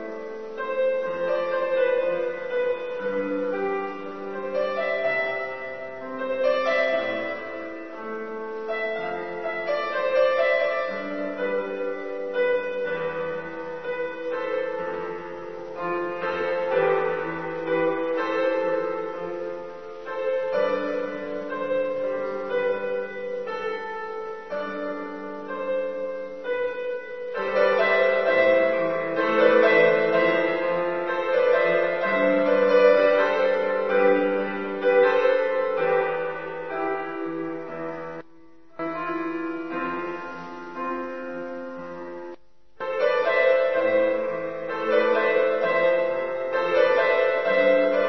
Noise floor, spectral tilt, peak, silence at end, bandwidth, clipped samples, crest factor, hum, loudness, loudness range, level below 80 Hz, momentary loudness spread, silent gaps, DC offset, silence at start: -54 dBFS; -6 dB/octave; -4 dBFS; 0 s; 6.2 kHz; under 0.1%; 20 dB; none; -24 LUFS; 10 LU; -66 dBFS; 14 LU; none; 0.5%; 0 s